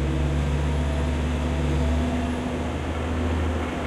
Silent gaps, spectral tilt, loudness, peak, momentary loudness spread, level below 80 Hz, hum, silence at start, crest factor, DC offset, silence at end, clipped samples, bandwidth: none; -7 dB/octave; -26 LUFS; -12 dBFS; 4 LU; -28 dBFS; none; 0 s; 12 dB; under 0.1%; 0 s; under 0.1%; 11.5 kHz